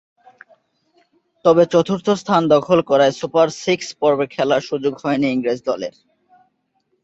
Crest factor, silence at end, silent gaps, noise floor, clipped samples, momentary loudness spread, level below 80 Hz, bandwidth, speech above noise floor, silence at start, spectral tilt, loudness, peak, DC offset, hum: 18 dB; 1.15 s; none; -68 dBFS; under 0.1%; 8 LU; -60 dBFS; 8 kHz; 51 dB; 1.45 s; -5.5 dB/octave; -17 LUFS; -2 dBFS; under 0.1%; none